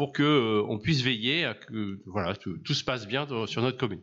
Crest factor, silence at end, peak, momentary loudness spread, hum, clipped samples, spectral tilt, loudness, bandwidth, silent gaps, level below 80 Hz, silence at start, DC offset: 16 dB; 0 s; -12 dBFS; 11 LU; none; under 0.1%; -5.5 dB/octave; -28 LUFS; 7.8 kHz; none; -60 dBFS; 0 s; under 0.1%